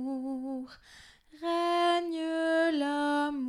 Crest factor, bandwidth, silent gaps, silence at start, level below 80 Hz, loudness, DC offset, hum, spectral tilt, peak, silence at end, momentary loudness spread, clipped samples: 14 dB; 11.5 kHz; none; 0 s; -68 dBFS; -30 LUFS; under 0.1%; none; -3 dB/octave; -16 dBFS; 0 s; 12 LU; under 0.1%